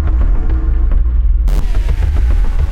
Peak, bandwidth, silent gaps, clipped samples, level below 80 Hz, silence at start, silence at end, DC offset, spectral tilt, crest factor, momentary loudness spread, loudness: -4 dBFS; 5.2 kHz; none; under 0.1%; -10 dBFS; 0 s; 0 s; under 0.1%; -8 dB/octave; 6 dB; 2 LU; -16 LUFS